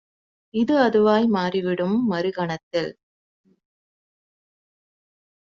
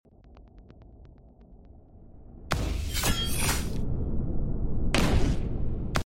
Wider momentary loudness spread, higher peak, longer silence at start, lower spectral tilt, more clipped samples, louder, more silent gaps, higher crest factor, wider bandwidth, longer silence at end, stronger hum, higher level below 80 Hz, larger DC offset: first, 10 LU vs 7 LU; first, -4 dBFS vs -8 dBFS; first, 0.55 s vs 0.3 s; about the same, -5 dB/octave vs -4.5 dB/octave; neither; first, -22 LUFS vs -29 LUFS; first, 2.63-2.71 s vs none; about the same, 20 dB vs 20 dB; second, 7.4 kHz vs 16.5 kHz; first, 2.7 s vs 0.05 s; neither; second, -64 dBFS vs -32 dBFS; neither